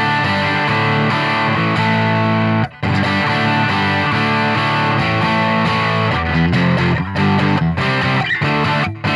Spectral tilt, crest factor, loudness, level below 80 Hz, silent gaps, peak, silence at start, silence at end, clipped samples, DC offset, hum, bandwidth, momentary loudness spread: -6.5 dB/octave; 12 dB; -15 LUFS; -40 dBFS; none; -4 dBFS; 0 s; 0 s; under 0.1%; under 0.1%; none; 11 kHz; 2 LU